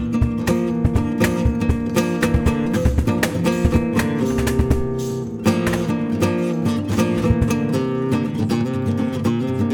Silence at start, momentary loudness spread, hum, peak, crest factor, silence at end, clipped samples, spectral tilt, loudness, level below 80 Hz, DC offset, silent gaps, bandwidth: 0 s; 3 LU; none; -2 dBFS; 16 dB; 0 s; under 0.1%; -6.5 dB/octave; -20 LUFS; -28 dBFS; under 0.1%; none; 19 kHz